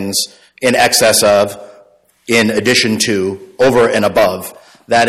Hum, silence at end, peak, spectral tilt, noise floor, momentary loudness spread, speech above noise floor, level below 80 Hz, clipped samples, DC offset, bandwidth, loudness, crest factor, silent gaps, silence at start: none; 0 s; 0 dBFS; -3 dB/octave; -48 dBFS; 12 LU; 35 dB; -48 dBFS; under 0.1%; under 0.1%; 16 kHz; -12 LUFS; 14 dB; none; 0 s